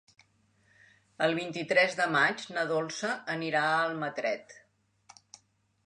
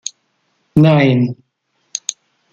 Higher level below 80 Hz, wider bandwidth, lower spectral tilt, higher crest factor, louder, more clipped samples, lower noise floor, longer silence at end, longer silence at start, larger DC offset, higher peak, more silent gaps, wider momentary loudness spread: second, -80 dBFS vs -50 dBFS; first, 10.5 kHz vs 9.2 kHz; second, -4 dB/octave vs -6 dB/octave; about the same, 20 dB vs 16 dB; second, -29 LUFS vs -15 LUFS; neither; about the same, -68 dBFS vs -66 dBFS; first, 1.3 s vs 0.4 s; first, 1.2 s vs 0.75 s; neither; second, -12 dBFS vs 0 dBFS; neither; second, 8 LU vs 18 LU